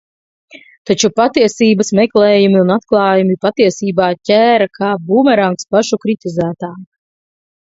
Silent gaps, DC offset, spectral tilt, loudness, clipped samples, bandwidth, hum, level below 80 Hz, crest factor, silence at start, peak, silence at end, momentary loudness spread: 0.78-0.85 s; under 0.1%; -5 dB/octave; -12 LUFS; under 0.1%; 8 kHz; none; -56 dBFS; 14 dB; 0.55 s; 0 dBFS; 0.9 s; 8 LU